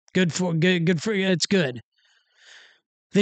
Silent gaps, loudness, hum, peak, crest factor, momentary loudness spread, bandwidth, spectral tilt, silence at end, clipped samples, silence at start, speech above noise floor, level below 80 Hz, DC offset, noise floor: 1.83-1.91 s, 2.86-3.10 s; -22 LUFS; none; -8 dBFS; 16 dB; 6 LU; 9.2 kHz; -5 dB/octave; 0 s; under 0.1%; 0.15 s; 42 dB; -68 dBFS; under 0.1%; -64 dBFS